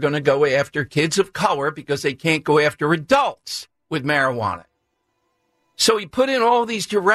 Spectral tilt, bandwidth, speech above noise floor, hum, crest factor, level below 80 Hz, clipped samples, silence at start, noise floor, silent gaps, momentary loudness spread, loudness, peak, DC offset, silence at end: -4 dB/octave; 14 kHz; 52 dB; none; 16 dB; -58 dBFS; under 0.1%; 0 s; -72 dBFS; none; 9 LU; -19 LUFS; -4 dBFS; under 0.1%; 0 s